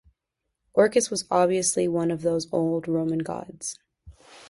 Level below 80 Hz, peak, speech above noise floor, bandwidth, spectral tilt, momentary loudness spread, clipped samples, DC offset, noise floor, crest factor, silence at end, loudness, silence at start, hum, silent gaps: -60 dBFS; -4 dBFS; 58 dB; 11.5 kHz; -4.5 dB/octave; 13 LU; under 0.1%; under 0.1%; -82 dBFS; 20 dB; 0.05 s; -25 LUFS; 0.75 s; none; none